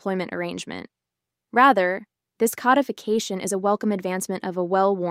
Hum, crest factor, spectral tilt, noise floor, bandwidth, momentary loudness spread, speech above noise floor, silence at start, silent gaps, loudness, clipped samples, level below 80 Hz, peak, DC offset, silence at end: none; 18 dB; -4.5 dB/octave; -85 dBFS; 16 kHz; 13 LU; 63 dB; 0.05 s; none; -23 LUFS; under 0.1%; -72 dBFS; -4 dBFS; under 0.1%; 0 s